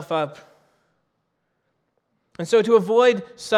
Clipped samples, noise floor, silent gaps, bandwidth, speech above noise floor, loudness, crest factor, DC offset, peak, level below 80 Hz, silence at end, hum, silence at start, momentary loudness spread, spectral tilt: under 0.1%; -73 dBFS; none; 12 kHz; 54 dB; -19 LUFS; 18 dB; under 0.1%; -4 dBFS; -70 dBFS; 0 s; none; 0 s; 14 LU; -5 dB/octave